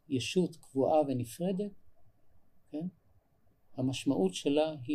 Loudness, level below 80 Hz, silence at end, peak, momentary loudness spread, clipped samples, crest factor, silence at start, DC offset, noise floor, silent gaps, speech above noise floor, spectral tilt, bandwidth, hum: -33 LUFS; -70 dBFS; 0 s; -16 dBFS; 13 LU; under 0.1%; 18 dB; 0.1 s; under 0.1%; -67 dBFS; none; 36 dB; -6 dB/octave; 15 kHz; none